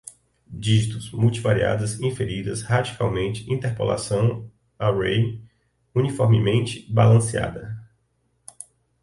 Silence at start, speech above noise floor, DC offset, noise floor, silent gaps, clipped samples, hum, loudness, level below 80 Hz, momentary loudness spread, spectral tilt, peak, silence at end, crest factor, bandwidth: 0.05 s; 47 dB; under 0.1%; -68 dBFS; none; under 0.1%; none; -22 LUFS; -48 dBFS; 18 LU; -6 dB/octave; -4 dBFS; 1.2 s; 18 dB; 11.5 kHz